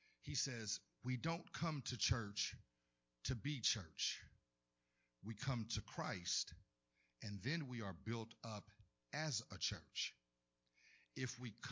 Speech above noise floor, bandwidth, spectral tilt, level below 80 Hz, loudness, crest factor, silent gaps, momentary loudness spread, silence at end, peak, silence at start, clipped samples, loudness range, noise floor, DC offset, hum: 43 dB; 7.8 kHz; -3 dB/octave; -64 dBFS; -45 LUFS; 22 dB; none; 11 LU; 0 s; -26 dBFS; 0.25 s; under 0.1%; 4 LU; -89 dBFS; under 0.1%; 60 Hz at -75 dBFS